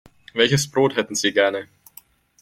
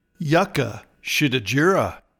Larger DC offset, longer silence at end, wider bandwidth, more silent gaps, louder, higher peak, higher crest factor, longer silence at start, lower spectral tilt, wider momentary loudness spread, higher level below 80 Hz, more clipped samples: neither; first, 0.75 s vs 0.2 s; second, 16.5 kHz vs 19 kHz; neither; about the same, -20 LUFS vs -21 LUFS; first, -2 dBFS vs -6 dBFS; about the same, 20 dB vs 16 dB; first, 0.35 s vs 0.2 s; second, -3.5 dB/octave vs -5 dB/octave; first, 13 LU vs 9 LU; about the same, -58 dBFS vs -54 dBFS; neither